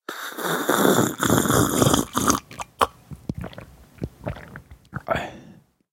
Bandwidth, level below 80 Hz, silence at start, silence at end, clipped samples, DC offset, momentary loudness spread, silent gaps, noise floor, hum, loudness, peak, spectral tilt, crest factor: 17 kHz; -44 dBFS; 0.1 s; 0.4 s; under 0.1%; under 0.1%; 19 LU; none; -50 dBFS; none; -22 LUFS; 0 dBFS; -4 dB/octave; 24 dB